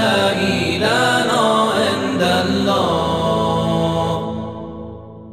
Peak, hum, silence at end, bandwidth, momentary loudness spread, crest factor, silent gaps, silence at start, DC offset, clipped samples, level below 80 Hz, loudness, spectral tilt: -2 dBFS; none; 0 s; 15.5 kHz; 14 LU; 14 dB; none; 0 s; under 0.1%; under 0.1%; -44 dBFS; -17 LUFS; -5 dB/octave